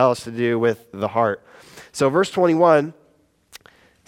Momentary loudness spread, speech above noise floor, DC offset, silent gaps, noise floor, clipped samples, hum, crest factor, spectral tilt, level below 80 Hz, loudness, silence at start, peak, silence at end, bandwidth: 13 LU; 41 dB; under 0.1%; none; -60 dBFS; under 0.1%; none; 18 dB; -6 dB/octave; -66 dBFS; -19 LUFS; 0 s; -2 dBFS; 1.15 s; 15.5 kHz